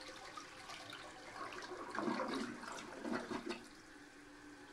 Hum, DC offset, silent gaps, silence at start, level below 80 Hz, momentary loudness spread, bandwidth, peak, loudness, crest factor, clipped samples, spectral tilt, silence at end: none; under 0.1%; none; 0 s; -72 dBFS; 16 LU; 15.5 kHz; -24 dBFS; -46 LUFS; 22 dB; under 0.1%; -3.5 dB/octave; 0 s